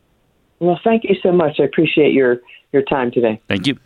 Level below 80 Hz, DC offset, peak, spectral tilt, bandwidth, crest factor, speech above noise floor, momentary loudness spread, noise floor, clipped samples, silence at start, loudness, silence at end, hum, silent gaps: -52 dBFS; under 0.1%; -2 dBFS; -7 dB/octave; 10.5 kHz; 14 dB; 44 dB; 6 LU; -60 dBFS; under 0.1%; 0.6 s; -16 LUFS; 0.1 s; none; none